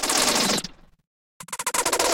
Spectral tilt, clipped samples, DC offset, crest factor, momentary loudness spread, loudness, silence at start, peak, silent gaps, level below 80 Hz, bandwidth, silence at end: -1 dB/octave; under 0.1%; under 0.1%; 22 dB; 15 LU; -22 LUFS; 0 s; -2 dBFS; 1.07-1.40 s; -52 dBFS; 17 kHz; 0 s